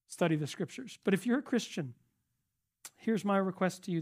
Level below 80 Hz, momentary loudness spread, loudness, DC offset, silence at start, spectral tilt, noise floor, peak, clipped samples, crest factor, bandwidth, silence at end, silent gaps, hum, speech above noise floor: -82 dBFS; 11 LU; -34 LUFS; under 0.1%; 0.1 s; -6 dB/octave; -84 dBFS; -14 dBFS; under 0.1%; 20 dB; 15.5 kHz; 0 s; none; none; 52 dB